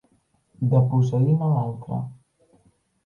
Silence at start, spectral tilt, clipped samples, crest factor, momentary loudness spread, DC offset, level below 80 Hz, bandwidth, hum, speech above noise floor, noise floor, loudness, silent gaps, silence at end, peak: 0.6 s; -11 dB/octave; under 0.1%; 16 dB; 12 LU; under 0.1%; -60 dBFS; 6.8 kHz; none; 44 dB; -65 dBFS; -22 LUFS; none; 0.9 s; -8 dBFS